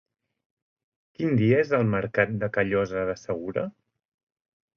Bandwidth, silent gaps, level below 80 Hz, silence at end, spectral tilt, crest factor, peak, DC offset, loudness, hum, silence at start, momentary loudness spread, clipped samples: 6.8 kHz; none; -56 dBFS; 1.05 s; -8 dB/octave; 20 dB; -8 dBFS; under 0.1%; -25 LUFS; none; 1.2 s; 10 LU; under 0.1%